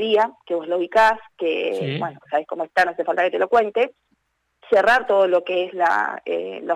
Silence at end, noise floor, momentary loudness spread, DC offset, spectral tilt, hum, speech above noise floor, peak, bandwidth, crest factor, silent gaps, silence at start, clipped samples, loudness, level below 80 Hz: 0 s; -68 dBFS; 9 LU; under 0.1%; -5 dB/octave; none; 48 dB; -8 dBFS; 13.5 kHz; 12 dB; none; 0 s; under 0.1%; -20 LUFS; -62 dBFS